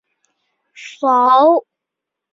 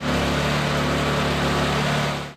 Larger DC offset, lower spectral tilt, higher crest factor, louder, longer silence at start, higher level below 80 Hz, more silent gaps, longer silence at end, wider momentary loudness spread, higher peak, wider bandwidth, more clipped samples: neither; second, -3.5 dB/octave vs -5 dB/octave; first, 16 dB vs 10 dB; first, -13 LUFS vs -22 LUFS; first, 0.8 s vs 0 s; second, -70 dBFS vs -36 dBFS; neither; first, 0.75 s vs 0 s; first, 24 LU vs 1 LU; first, -2 dBFS vs -10 dBFS; second, 7.6 kHz vs 15.5 kHz; neither